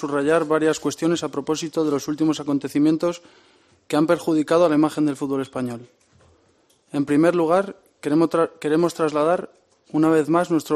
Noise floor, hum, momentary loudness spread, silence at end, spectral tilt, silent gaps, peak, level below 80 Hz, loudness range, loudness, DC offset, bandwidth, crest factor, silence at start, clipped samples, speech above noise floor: -61 dBFS; none; 10 LU; 0 s; -6 dB/octave; none; -4 dBFS; -64 dBFS; 2 LU; -21 LUFS; under 0.1%; 14 kHz; 16 dB; 0 s; under 0.1%; 40 dB